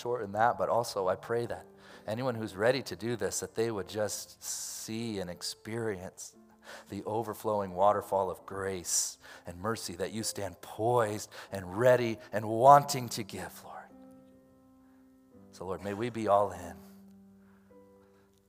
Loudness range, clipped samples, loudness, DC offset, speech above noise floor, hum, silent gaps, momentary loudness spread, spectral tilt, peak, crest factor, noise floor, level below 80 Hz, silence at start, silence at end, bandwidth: 9 LU; under 0.1%; -31 LUFS; under 0.1%; 31 dB; none; none; 17 LU; -4 dB/octave; -6 dBFS; 26 dB; -63 dBFS; -72 dBFS; 0 s; 0.7 s; 16 kHz